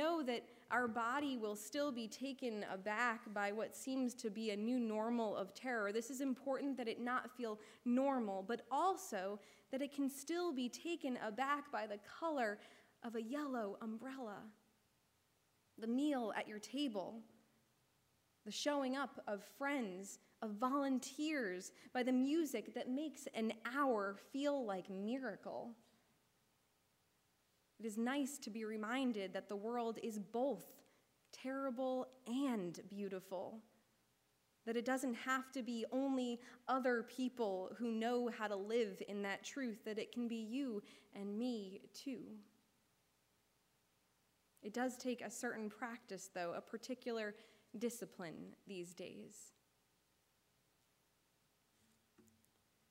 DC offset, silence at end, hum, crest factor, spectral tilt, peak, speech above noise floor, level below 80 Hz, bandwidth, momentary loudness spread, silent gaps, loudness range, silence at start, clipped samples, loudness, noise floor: under 0.1%; 0.7 s; none; 20 dB; -4 dB/octave; -24 dBFS; 37 dB; under -90 dBFS; 16 kHz; 12 LU; none; 8 LU; 0 s; under 0.1%; -43 LUFS; -80 dBFS